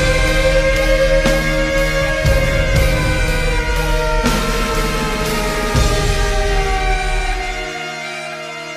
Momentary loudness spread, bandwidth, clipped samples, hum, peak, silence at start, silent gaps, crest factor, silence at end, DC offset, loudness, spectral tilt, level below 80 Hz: 9 LU; 15.5 kHz; under 0.1%; none; -2 dBFS; 0 s; none; 12 dB; 0 s; under 0.1%; -17 LUFS; -4.5 dB/octave; -20 dBFS